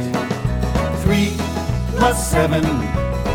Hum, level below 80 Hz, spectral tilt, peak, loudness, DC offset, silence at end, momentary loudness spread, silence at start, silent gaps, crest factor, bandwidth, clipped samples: none; -26 dBFS; -5.5 dB/octave; -2 dBFS; -19 LUFS; under 0.1%; 0 s; 5 LU; 0 s; none; 16 dB; 18.5 kHz; under 0.1%